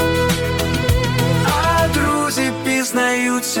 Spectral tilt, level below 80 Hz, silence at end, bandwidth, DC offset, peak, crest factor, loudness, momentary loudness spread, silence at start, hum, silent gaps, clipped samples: -4.5 dB/octave; -32 dBFS; 0 s; 18 kHz; under 0.1%; -4 dBFS; 14 dB; -17 LUFS; 3 LU; 0 s; none; none; under 0.1%